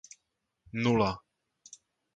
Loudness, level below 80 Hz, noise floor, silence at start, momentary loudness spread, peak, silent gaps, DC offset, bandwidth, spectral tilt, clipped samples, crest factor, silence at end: -30 LUFS; -60 dBFS; -81 dBFS; 0.75 s; 25 LU; -12 dBFS; none; under 0.1%; 9 kHz; -6 dB/octave; under 0.1%; 22 dB; 0.95 s